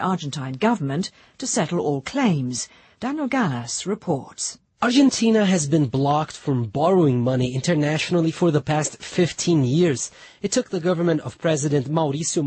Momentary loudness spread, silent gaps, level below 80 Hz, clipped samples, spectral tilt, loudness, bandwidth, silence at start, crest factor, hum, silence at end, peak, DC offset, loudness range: 10 LU; none; -58 dBFS; under 0.1%; -5 dB/octave; -22 LUFS; 8.8 kHz; 0 s; 14 dB; none; 0 s; -6 dBFS; under 0.1%; 4 LU